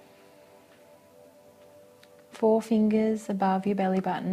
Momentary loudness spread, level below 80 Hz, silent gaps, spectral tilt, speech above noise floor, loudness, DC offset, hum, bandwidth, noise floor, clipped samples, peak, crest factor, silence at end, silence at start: 4 LU; -72 dBFS; none; -7.5 dB/octave; 30 dB; -26 LUFS; under 0.1%; none; 13 kHz; -55 dBFS; under 0.1%; -12 dBFS; 16 dB; 0 s; 2.35 s